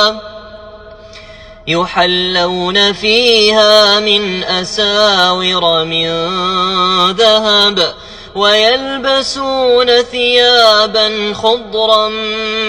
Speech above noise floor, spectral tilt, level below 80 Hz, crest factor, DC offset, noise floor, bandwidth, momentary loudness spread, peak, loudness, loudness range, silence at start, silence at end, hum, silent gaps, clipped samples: 23 dB; -3 dB/octave; -42 dBFS; 12 dB; under 0.1%; -34 dBFS; 16.5 kHz; 8 LU; 0 dBFS; -10 LUFS; 2 LU; 0 s; 0 s; none; none; 0.3%